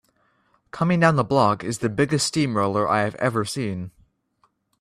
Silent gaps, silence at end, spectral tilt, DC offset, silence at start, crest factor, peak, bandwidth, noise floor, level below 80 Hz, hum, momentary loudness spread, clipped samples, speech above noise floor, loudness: none; 0.9 s; -5.5 dB/octave; under 0.1%; 0.75 s; 20 dB; -4 dBFS; 14.5 kHz; -67 dBFS; -58 dBFS; none; 10 LU; under 0.1%; 45 dB; -22 LUFS